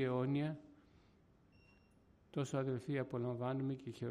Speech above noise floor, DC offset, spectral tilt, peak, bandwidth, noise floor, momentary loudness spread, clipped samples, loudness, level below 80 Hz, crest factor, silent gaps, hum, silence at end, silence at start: 30 dB; under 0.1%; -7.5 dB/octave; -26 dBFS; 10.5 kHz; -69 dBFS; 7 LU; under 0.1%; -41 LUFS; -74 dBFS; 14 dB; none; none; 0 s; 0 s